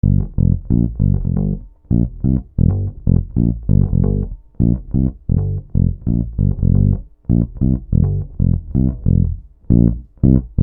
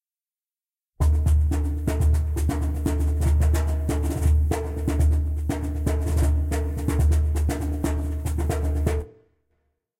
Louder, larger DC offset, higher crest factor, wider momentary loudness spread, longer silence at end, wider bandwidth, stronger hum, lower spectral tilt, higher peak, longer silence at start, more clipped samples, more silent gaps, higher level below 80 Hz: first, -18 LUFS vs -24 LUFS; neither; about the same, 16 dB vs 12 dB; about the same, 5 LU vs 5 LU; second, 0 s vs 0.9 s; second, 1.6 kHz vs 15.5 kHz; neither; first, -16.5 dB/octave vs -7 dB/octave; first, 0 dBFS vs -10 dBFS; second, 0.05 s vs 1 s; neither; neither; about the same, -22 dBFS vs -26 dBFS